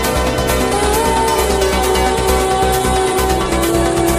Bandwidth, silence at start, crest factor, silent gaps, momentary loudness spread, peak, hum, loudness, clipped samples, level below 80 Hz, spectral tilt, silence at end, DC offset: 15.5 kHz; 0 s; 14 dB; none; 1 LU; -2 dBFS; none; -14 LUFS; under 0.1%; -24 dBFS; -4 dB/octave; 0 s; under 0.1%